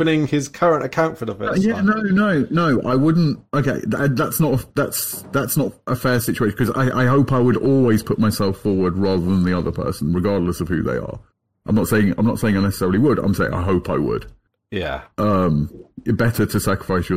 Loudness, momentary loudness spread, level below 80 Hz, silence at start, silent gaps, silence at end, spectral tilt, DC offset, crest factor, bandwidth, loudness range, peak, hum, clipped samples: -19 LUFS; 7 LU; -44 dBFS; 0 s; none; 0 s; -6.5 dB/octave; 0.7%; 14 dB; 16.5 kHz; 3 LU; -4 dBFS; none; under 0.1%